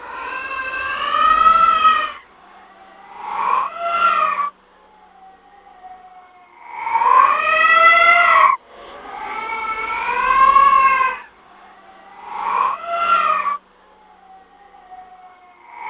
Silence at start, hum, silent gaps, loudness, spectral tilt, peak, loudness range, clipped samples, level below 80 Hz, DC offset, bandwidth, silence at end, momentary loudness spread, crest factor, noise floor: 0 s; none; none; -15 LUFS; -4.5 dB/octave; 0 dBFS; 8 LU; under 0.1%; -52 dBFS; under 0.1%; 4 kHz; 0 s; 18 LU; 18 dB; -50 dBFS